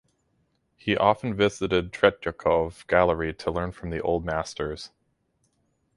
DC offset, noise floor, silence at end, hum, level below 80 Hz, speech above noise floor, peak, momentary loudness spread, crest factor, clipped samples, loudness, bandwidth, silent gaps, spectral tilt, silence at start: under 0.1%; -71 dBFS; 1.1 s; none; -46 dBFS; 46 dB; -4 dBFS; 10 LU; 22 dB; under 0.1%; -25 LUFS; 11.5 kHz; none; -5.5 dB/octave; 0.85 s